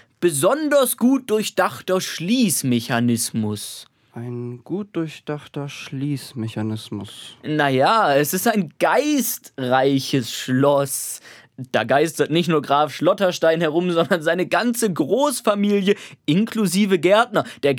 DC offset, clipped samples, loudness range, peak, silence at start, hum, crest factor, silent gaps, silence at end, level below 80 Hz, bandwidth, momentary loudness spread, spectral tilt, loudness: under 0.1%; under 0.1%; 8 LU; -2 dBFS; 0.2 s; none; 18 dB; none; 0 s; -72 dBFS; over 20 kHz; 13 LU; -4.5 dB/octave; -20 LUFS